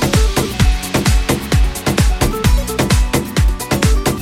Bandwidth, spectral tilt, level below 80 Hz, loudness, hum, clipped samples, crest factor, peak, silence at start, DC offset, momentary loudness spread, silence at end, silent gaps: 16.5 kHz; -5 dB/octave; -16 dBFS; -16 LUFS; none; under 0.1%; 14 dB; 0 dBFS; 0 s; under 0.1%; 2 LU; 0 s; none